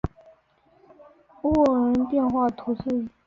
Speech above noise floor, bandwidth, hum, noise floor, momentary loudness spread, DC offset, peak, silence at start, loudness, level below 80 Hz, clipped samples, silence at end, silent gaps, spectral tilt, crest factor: 39 dB; 7 kHz; none; -61 dBFS; 10 LU; under 0.1%; -10 dBFS; 0.05 s; -24 LUFS; -46 dBFS; under 0.1%; 0.2 s; none; -9 dB/octave; 16 dB